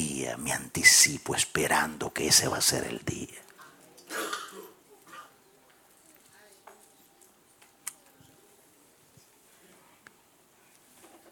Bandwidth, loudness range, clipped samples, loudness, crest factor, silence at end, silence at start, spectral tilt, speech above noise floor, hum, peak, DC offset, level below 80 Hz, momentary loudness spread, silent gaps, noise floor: 19 kHz; 27 LU; under 0.1%; -24 LUFS; 26 dB; 3.4 s; 0 s; -1 dB/octave; 36 dB; none; -6 dBFS; under 0.1%; -62 dBFS; 25 LU; none; -62 dBFS